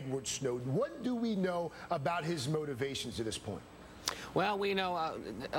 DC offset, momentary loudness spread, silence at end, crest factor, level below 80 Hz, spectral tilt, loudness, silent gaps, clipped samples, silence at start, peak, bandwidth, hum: under 0.1%; 7 LU; 0 s; 24 dB; -62 dBFS; -4.5 dB/octave; -36 LUFS; none; under 0.1%; 0 s; -12 dBFS; 17 kHz; none